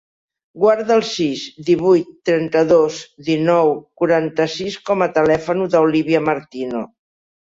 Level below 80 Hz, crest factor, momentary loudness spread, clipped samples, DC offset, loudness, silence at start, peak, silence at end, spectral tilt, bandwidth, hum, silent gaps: -56 dBFS; 14 dB; 11 LU; under 0.1%; under 0.1%; -17 LUFS; 0.55 s; -2 dBFS; 0.7 s; -6 dB/octave; 7.8 kHz; none; none